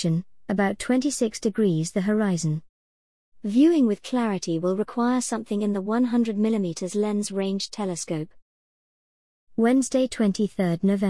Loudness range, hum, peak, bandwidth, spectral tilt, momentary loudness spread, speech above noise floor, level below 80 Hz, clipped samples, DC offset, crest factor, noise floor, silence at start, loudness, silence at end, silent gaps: 4 LU; none; -10 dBFS; 12 kHz; -6 dB/octave; 8 LU; over 67 dB; -60 dBFS; under 0.1%; 0.3%; 14 dB; under -90 dBFS; 0 s; -24 LUFS; 0 s; 2.69-3.32 s, 8.42-9.47 s